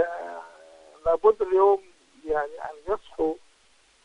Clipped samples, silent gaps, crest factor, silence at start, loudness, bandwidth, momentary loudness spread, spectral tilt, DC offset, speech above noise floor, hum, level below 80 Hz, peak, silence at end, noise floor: under 0.1%; none; 20 dB; 0 s; -25 LUFS; 9.8 kHz; 18 LU; -6 dB/octave; under 0.1%; 37 dB; none; -54 dBFS; -6 dBFS; 0.7 s; -61 dBFS